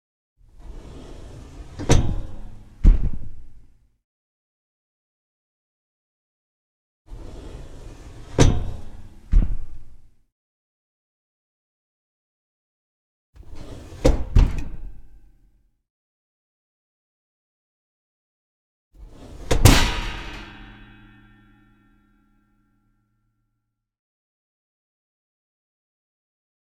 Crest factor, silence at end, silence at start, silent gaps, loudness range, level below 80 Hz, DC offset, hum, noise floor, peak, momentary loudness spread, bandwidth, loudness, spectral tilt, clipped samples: 26 dB; 6 s; 0.6 s; 4.04-7.05 s, 10.32-13.33 s, 15.90-18.91 s; 17 LU; -28 dBFS; under 0.1%; none; -78 dBFS; 0 dBFS; 24 LU; 17.5 kHz; -22 LUFS; -5 dB/octave; under 0.1%